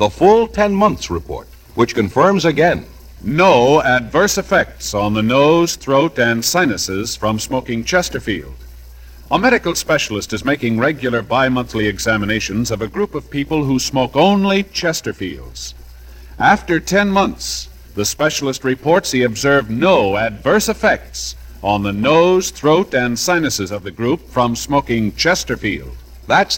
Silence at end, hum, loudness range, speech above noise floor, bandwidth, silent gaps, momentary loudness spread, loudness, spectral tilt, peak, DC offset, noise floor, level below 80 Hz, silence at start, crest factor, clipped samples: 0 s; none; 4 LU; 21 dB; 17.5 kHz; none; 11 LU; -16 LUFS; -4.5 dB/octave; 0 dBFS; under 0.1%; -37 dBFS; -38 dBFS; 0 s; 16 dB; under 0.1%